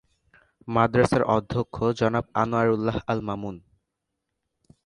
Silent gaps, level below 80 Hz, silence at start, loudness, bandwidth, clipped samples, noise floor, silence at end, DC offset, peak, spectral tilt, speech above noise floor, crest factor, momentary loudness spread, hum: none; -50 dBFS; 0.65 s; -24 LUFS; 11 kHz; under 0.1%; -81 dBFS; 1.25 s; under 0.1%; -4 dBFS; -7 dB/octave; 58 dB; 22 dB; 12 LU; none